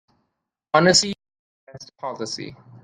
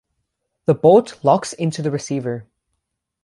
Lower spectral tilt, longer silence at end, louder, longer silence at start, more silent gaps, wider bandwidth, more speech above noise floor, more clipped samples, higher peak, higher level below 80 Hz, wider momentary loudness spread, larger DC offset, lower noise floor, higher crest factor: second, -3 dB/octave vs -6.5 dB/octave; second, 0.3 s vs 0.8 s; about the same, -19 LUFS vs -18 LUFS; about the same, 0.75 s vs 0.7 s; first, 1.39-1.67 s vs none; about the same, 11 kHz vs 11.5 kHz; about the same, 57 dB vs 59 dB; neither; about the same, -2 dBFS vs -2 dBFS; about the same, -60 dBFS vs -62 dBFS; first, 20 LU vs 12 LU; neither; about the same, -78 dBFS vs -76 dBFS; about the same, 22 dB vs 18 dB